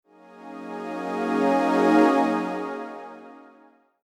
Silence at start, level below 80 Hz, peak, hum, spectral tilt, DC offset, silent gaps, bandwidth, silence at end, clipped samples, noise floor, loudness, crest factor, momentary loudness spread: 0.35 s; -84 dBFS; -6 dBFS; none; -6 dB/octave; under 0.1%; none; 12 kHz; 0.65 s; under 0.1%; -56 dBFS; -23 LUFS; 18 dB; 22 LU